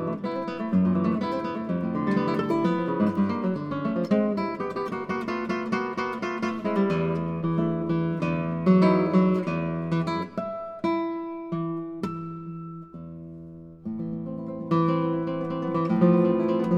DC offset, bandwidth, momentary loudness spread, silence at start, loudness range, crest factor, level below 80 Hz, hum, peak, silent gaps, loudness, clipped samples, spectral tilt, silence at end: under 0.1%; 7.2 kHz; 13 LU; 0 s; 8 LU; 18 dB; -62 dBFS; none; -8 dBFS; none; -26 LUFS; under 0.1%; -9 dB/octave; 0 s